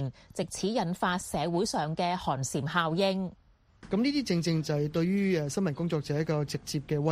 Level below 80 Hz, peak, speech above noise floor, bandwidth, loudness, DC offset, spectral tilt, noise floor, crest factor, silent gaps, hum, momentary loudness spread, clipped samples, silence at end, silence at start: -58 dBFS; -12 dBFS; 25 dB; 15.5 kHz; -30 LUFS; under 0.1%; -5.5 dB/octave; -55 dBFS; 18 dB; none; none; 6 LU; under 0.1%; 0 s; 0 s